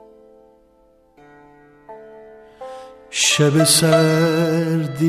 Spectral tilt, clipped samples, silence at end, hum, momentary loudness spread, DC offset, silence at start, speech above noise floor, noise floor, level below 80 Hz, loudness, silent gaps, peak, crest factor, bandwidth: -4 dB/octave; under 0.1%; 0 s; none; 23 LU; under 0.1%; 1.9 s; 39 dB; -55 dBFS; -60 dBFS; -15 LUFS; none; -2 dBFS; 18 dB; 14 kHz